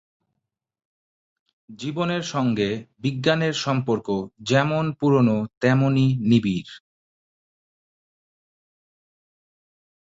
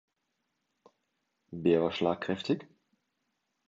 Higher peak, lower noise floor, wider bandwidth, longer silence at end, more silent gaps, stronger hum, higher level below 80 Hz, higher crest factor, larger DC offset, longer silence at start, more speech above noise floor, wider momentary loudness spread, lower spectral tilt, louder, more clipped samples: first, -4 dBFS vs -12 dBFS; about the same, -81 dBFS vs -82 dBFS; about the same, 7.8 kHz vs 7.8 kHz; first, 3.4 s vs 1.05 s; first, 5.57-5.61 s vs none; neither; first, -60 dBFS vs -66 dBFS; about the same, 20 dB vs 22 dB; neither; first, 1.7 s vs 1.5 s; first, 60 dB vs 52 dB; about the same, 9 LU vs 7 LU; about the same, -6.5 dB/octave vs -7 dB/octave; first, -22 LUFS vs -30 LUFS; neither